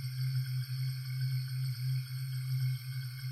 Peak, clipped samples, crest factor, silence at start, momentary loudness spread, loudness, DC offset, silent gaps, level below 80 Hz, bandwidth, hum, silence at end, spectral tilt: -26 dBFS; under 0.1%; 10 dB; 0 s; 4 LU; -36 LUFS; under 0.1%; none; -70 dBFS; 14.5 kHz; none; 0 s; -5 dB/octave